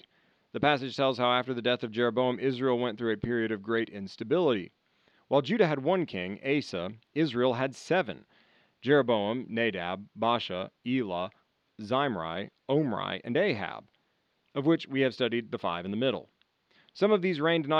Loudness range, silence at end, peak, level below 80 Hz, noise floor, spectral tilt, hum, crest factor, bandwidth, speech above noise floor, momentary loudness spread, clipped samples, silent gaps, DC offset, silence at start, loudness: 3 LU; 0 s; -8 dBFS; -70 dBFS; -74 dBFS; -6.5 dB/octave; none; 20 dB; 9.8 kHz; 45 dB; 10 LU; under 0.1%; none; under 0.1%; 0.55 s; -29 LUFS